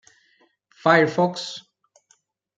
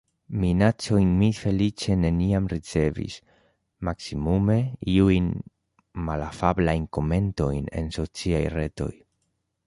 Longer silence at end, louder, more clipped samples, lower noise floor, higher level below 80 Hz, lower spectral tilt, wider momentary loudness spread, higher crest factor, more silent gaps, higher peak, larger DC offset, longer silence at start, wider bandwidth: first, 1 s vs 0.75 s; first, -21 LUFS vs -25 LUFS; neither; second, -64 dBFS vs -75 dBFS; second, -76 dBFS vs -38 dBFS; second, -5.5 dB/octave vs -7 dB/octave; first, 16 LU vs 12 LU; about the same, 22 dB vs 20 dB; neither; about the same, -4 dBFS vs -4 dBFS; neither; first, 0.85 s vs 0.3 s; second, 9.2 kHz vs 11.5 kHz